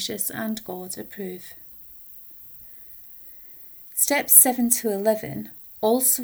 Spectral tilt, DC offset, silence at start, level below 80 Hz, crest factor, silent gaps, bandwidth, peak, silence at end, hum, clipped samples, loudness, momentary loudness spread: -2 dB/octave; under 0.1%; 0 s; -64 dBFS; 24 dB; none; over 20 kHz; 0 dBFS; 0 s; none; under 0.1%; -19 LUFS; 25 LU